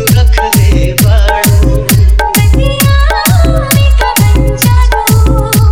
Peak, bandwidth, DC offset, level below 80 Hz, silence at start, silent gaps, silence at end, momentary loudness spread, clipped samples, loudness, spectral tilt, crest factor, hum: 0 dBFS; over 20 kHz; 2%; -10 dBFS; 0 s; none; 0 s; 1 LU; 0.9%; -8 LUFS; -5 dB/octave; 6 dB; none